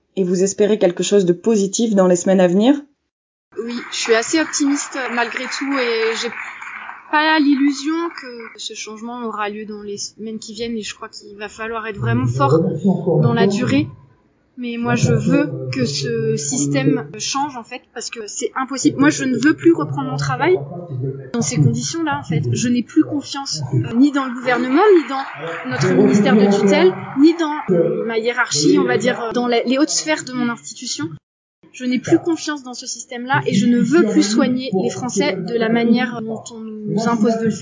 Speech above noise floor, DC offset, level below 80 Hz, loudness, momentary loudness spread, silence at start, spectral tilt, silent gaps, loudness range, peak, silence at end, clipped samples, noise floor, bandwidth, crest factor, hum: 38 dB; under 0.1%; -54 dBFS; -18 LUFS; 13 LU; 0.15 s; -5 dB/octave; 3.11-3.51 s, 31.23-31.62 s; 6 LU; -2 dBFS; 0 s; under 0.1%; -55 dBFS; 7.8 kHz; 16 dB; none